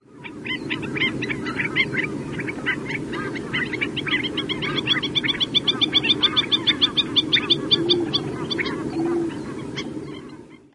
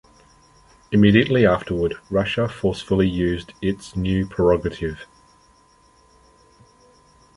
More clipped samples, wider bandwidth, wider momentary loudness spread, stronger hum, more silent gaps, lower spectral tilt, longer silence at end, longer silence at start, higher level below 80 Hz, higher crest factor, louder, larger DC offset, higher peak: neither; about the same, 11.5 kHz vs 11 kHz; about the same, 13 LU vs 11 LU; neither; neither; second, -4 dB/octave vs -7.5 dB/octave; second, 0.15 s vs 2.3 s; second, 0.1 s vs 0.9 s; second, -52 dBFS vs -40 dBFS; about the same, 18 dB vs 20 dB; about the same, -21 LUFS vs -20 LUFS; neither; second, -6 dBFS vs -2 dBFS